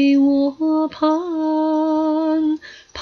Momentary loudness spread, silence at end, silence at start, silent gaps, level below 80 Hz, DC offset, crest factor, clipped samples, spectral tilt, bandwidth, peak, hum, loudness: 6 LU; 0 s; 0 s; none; -60 dBFS; under 0.1%; 10 dB; under 0.1%; -5.5 dB/octave; 6.4 kHz; -6 dBFS; none; -19 LUFS